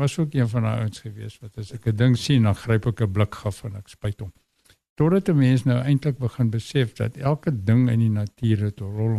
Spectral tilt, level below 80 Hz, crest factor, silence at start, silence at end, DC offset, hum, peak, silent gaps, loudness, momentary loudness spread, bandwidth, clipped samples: -7.5 dB/octave; -50 dBFS; 16 dB; 0 s; 0 s; under 0.1%; none; -6 dBFS; 4.89-4.96 s; -23 LUFS; 17 LU; 12.5 kHz; under 0.1%